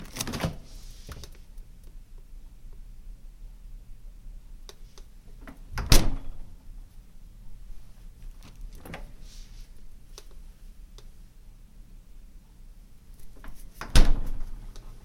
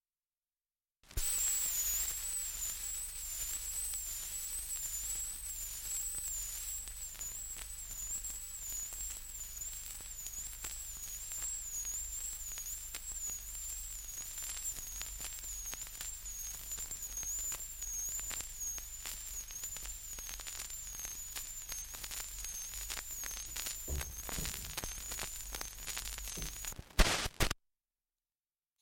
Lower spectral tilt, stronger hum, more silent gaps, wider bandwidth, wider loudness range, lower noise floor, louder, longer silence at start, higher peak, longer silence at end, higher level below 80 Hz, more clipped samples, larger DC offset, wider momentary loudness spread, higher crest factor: first, -3.5 dB/octave vs -1 dB/octave; neither; neither; about the same, 16 kHz vs 17 kHz; first, 21 LU vs 5 LU; second, -48 dBFS vs under -90 dBFS; first, -30 LUFS vs -39 LUFS; second, 0 s vs 1.05 s; first, 0 dBFS vs -12 dBFS; second, 0.05 s vs 1.25 s; first, -32 dBFS vs -48 dBFS; neither; neither; first, 27 LU vs 8 LU; about the same, 28 dB vs 30 dB